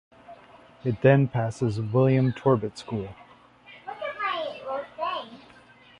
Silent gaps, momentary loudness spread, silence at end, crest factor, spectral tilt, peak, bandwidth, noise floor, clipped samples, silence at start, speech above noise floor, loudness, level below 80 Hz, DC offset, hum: none; 15 LU; 0.6 s; 20 dB; -8 dB/octave; -6 dBFS; 10 kHz; -53 dBFS; under 0.1%; 0.3 s; 30 dB; -26 LUFS; -58 dBFS; under 0.1%; 60 Hz at -55 dBFS